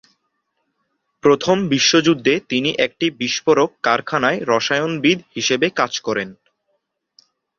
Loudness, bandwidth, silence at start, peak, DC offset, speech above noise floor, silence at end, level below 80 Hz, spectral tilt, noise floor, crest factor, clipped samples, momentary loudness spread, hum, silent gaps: -17 LUFS; 7.4 kHz; 1.25 s; -2 dBFS; under 0.1%; 54 dB; 1.25 s; -60 dBFS; -3.5 dB/octave; -72 dBFS; 18 dB; under 0.1%; 6 LU; none; none